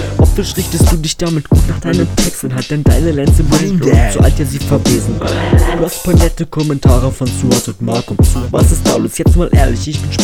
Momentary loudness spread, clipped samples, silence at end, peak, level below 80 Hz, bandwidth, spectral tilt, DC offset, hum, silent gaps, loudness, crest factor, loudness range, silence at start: 6 LU; 0.4%; 0 s; 0 dBFS; -16 dBFS; 16.5 kHz; -5.5 dB/octave; 0.1%; none; none; -13 LUFS; 10 dB; 1 LU; 0 s